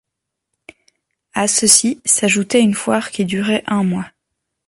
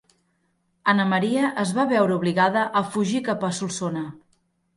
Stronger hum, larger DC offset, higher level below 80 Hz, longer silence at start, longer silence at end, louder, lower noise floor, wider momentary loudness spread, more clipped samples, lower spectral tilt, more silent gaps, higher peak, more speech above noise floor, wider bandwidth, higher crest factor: neither; neither; first, -58 dBFS vs -66 dBFS; first, 1.35 s vs 0.85 s; about the same, 0.6 s vs 0.6 s; first, -15 LUFS vs -23 LUFS; first, -80 dBFS vs -69 dBFS; first, 10 LU vs 7 LU; neither; second, -3 dB/octave vs -5.5 dB/octave; neither; first, 0 dBFS vs -6 dBFS; first, 64 dB vs 47 dB; first, 16 kHz vs 11.5 kHz; about the same, 18 dB vs 18 dB